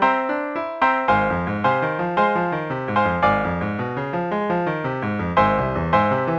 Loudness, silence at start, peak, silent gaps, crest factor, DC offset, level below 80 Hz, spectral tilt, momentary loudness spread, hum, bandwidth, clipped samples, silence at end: -21 LUFS; 0 s; -2 dBFS; none; 18 dB; under 0.1%; -44 dBFS; -8 dB/octave; 6 LU; none; 7.6 kHz; under 0.1%; 0 s